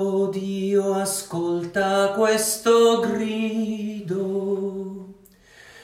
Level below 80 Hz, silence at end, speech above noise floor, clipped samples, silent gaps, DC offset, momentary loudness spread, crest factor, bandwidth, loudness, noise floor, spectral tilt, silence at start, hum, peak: -62 dBFS; 0 s; 30 dB; under 0.1%; none; under 0.1%; 11 LU; 16 dB; 16 kHz; -22 LUFS; -51 dBFS; -4 dB/octave; 0 s; none; -6 dBFS